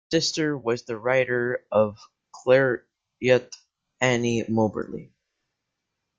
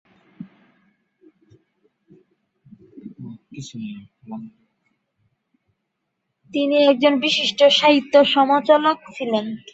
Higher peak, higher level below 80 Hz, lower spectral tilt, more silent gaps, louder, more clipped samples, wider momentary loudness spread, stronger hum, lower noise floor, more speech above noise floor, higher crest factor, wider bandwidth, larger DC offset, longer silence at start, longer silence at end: second, -6 dBFS vs -2 dBFS; first, -62 dBFS vs -70 dBFS; about the same, -5 dB/octave vs -4 dB/octave; neither; second, -24 LUFS vs -17 LUFS; neither; second, 12 LU vs 23 LU; neither; first, -81 dBFS vs -77 dBFS; about the same, 58 dB vs 59 dB; about the same, 20 dB vs 20 dB; about the same, 7.8 kHz vs 8 kHz; neither; second, 0.1 s vs 0.4 s; first, 1.15 s vs 0.15 s